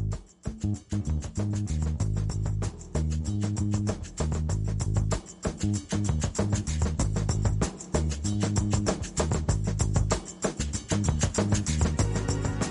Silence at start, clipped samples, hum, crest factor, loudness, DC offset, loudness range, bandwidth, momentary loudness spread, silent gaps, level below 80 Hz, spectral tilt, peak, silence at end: 0 s; under 0.1%; none; 16 dB; -29 LUFS; under 0.1%; 2 LU; 11.5 kHz; 6 LU; none; -34 dBFS; -5.5 dB/octave; -12 dBFS; 0 s